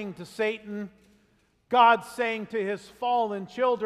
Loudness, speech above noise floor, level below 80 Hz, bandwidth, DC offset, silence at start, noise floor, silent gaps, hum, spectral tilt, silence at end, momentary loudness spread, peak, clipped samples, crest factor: -26 LUFS; 40 dB; -70 dBFS; 14 kHz; under 0.1%; 0 s; -66 dBFS; none; none; -5 dB/octave; 0 s; 18 LU; -8 dBFS; under 0.1%; 20 dB